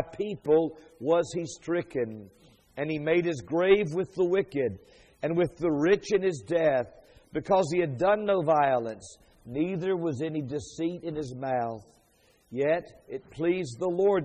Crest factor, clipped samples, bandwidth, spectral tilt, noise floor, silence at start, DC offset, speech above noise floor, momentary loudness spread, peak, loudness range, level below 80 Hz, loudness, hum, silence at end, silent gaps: 20 dB; under 0.1%; 9.8 kHz; -6.5 dB/octave; -64 dBFS; 0 s; under 0.1%; 37 dB; 13 LU; -8 dBFS; 6 LU; -60 dBFS; -28 LUFS; none; 0 s; none